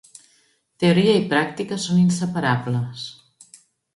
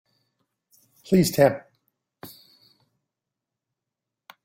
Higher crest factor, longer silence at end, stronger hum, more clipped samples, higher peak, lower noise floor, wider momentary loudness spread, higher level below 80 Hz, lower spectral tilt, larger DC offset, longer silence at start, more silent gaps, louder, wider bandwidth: second, 18 dB vs 24 dB; second, 0.85 s vs 2.2 s; neither; neither; about the same, -4 dBFS vs -4 dBFS; second, -62 dBFS vs -86 dBFS; second, 11 LU vs 26 LU; about the same, -62 dBFS vs -60 dBFS; about the same, -6 dB/octave vs -6 dB/octave; neither; second, 0.8 s vs 1.1 s; neither; about the same, -20 LUFS vs -21 LUFS; second, 11.5 kHz vs 16.5 kHz